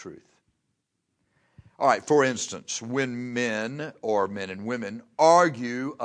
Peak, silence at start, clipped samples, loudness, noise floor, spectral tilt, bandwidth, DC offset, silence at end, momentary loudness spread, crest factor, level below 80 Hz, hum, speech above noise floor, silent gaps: -6 dBFS; 0 s; under 0.1%; -25 LUFS; -78 dBFS; -4 dB/octave; 10.5 kHz; under 0.1%; 0 s; 14 LU; 20 dB; -72 dBFS; none; 53 dB; none